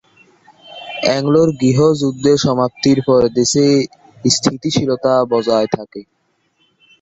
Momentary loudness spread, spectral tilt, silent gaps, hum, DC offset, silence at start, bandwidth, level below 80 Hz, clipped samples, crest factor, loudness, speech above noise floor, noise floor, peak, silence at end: 10 LU; -5 dB/octave; none; none; under 0.1%; 0.7 s; 8.4 kHz; -50 dBFS; under 0.1%; 16 dB; -15 LUFS; 47 dB; -61 dBFS; 0 dBFS; 1 s